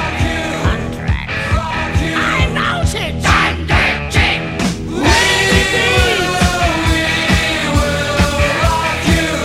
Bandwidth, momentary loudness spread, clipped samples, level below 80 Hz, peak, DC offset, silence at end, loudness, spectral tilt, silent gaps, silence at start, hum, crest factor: 16 kHz; 6 LU; under 0.1%; -22 dBFS; 0 dBFS; under 0.1%; 0 s; -14 LUFS; -4 dB/octave; none; 0 s; none; 14 dB